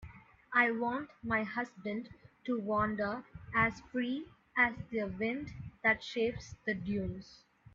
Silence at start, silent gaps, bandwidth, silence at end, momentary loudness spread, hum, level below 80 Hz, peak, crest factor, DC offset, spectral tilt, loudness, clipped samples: 0 s; none; 7.6 kHz; 0.4 s; 12 LU; none; -60 dBFS; -14 dBFS; 22 dB; under 0.1%; -6 dB/octave; -34 LUFS; under 0.1%